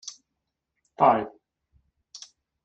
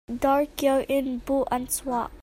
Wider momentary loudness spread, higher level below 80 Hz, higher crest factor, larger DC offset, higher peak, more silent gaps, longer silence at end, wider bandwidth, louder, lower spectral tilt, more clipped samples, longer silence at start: first, 24 LU vs 4 LU; second, -66 dBFS vs -48 dBFS; first, 24 dB vs 18 dB; neither; about the same, -6 dBFS vs -8 dBFS; neither; first, 0.5 s vs 0 s; second, 8.2 kHz vs 16.5 kHz; first, -22 LUFS vs -25 LUFS; first, -5 dB/octave vs -3.5 dB/octave; neither; about the same, 0.05 s vs 0.1 s